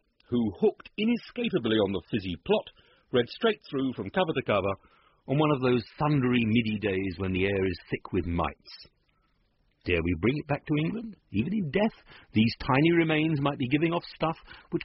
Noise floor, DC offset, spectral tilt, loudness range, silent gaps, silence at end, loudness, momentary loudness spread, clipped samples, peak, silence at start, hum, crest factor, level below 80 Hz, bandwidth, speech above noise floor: -70 dBFS; under 0.1%; -5 dB/octave; 5 LU; none; 0 s; -28 LUFS; 8 LU; under 0.1%; -10 dBFS; 0.3 s; none; 18 dB; -52 dBFS; 5.8 kHz; 42 dB